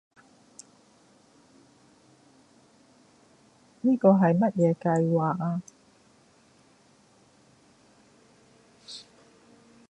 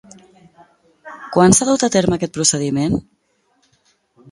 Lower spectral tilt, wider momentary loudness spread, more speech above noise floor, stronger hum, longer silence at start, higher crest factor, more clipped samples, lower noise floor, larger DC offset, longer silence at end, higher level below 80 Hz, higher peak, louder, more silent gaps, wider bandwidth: first, -8 dB/octave vs -4 dB/octave; first, 25 LU vs 12 LU; second, 37 dB vs 48 dB; neither; first, 3.85 s vs 1.05 s; about the same, 24 dB vs 20 dB; neither; about the same, -60 dBFS vs -63 dBFS; neither; second, 0.9 s vs 1.3 s; second, -72 dBFS vs -46 dBFS; second, -6 dBFS vs 0 dBFS; second, -24 LUFS vs -16 LUFS; neither; second, 9.8 kHz vs 11.5 kHz